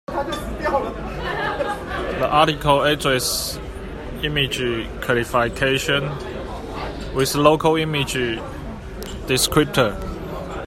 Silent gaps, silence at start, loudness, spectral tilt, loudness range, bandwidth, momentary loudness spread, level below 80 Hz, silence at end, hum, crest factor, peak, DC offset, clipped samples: none; 0.1 s; -21 LUFS; -4 dB/octave; 2 LU; 16 kHz; 14 LU; -36 dBFS; 0 s; none; 20 dB; 0 dBFS; under 0.1%; under 0.1%